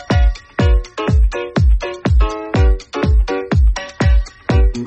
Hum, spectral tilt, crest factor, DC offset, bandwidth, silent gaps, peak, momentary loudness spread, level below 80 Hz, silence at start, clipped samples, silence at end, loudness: none; -7 dB/octave; 10 dB; under 0.1%; 8 kHz; none; -2 dBFS; 3 LU; -16 dBFS; 0 s; under 0.1%; 0 s; -17 LUFS